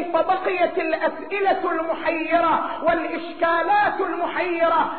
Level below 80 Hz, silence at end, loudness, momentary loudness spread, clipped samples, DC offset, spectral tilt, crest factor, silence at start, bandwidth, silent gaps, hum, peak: -56 dBFS; 0 s; -22 LUFS; 5 LU; under 0.1%; 0.7%; -1.5 dB/octave; 14 dB; 0 s; 4.5 kHz; none; none; -8 dBFS